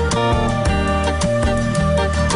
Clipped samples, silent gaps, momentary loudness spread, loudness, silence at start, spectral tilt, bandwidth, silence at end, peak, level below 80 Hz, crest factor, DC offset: under 0.1%; none; 1 LU; -18 LUFS; 0 s; -5.5 dB/octave; 11 kHz; 0 s; -8 dBFS; -24 dBFS; 10 dB; under 0.1%